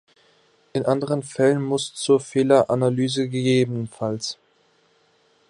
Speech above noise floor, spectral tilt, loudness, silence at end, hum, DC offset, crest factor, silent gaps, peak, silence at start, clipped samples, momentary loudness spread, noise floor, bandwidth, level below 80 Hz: 41 dB; -5.5 dB/octave; -22 LUFS; 1.15 s; none; under 0.1%; 20 dB; none; -4 dBFS; 0.75 s; under 0.1%; 10 LU; -62 dBFS; 11 kHz; -64 dBFS